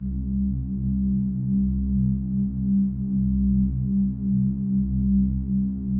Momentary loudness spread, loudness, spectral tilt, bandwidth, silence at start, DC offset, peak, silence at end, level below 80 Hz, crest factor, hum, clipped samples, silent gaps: 4 LU; -24 LUFS; -17 dB/octave; 1 kHz; 0 s; under 0.1%; -14 dBFS; 0 s; -32 dBFS; 10 dB; none; under 0.1%; none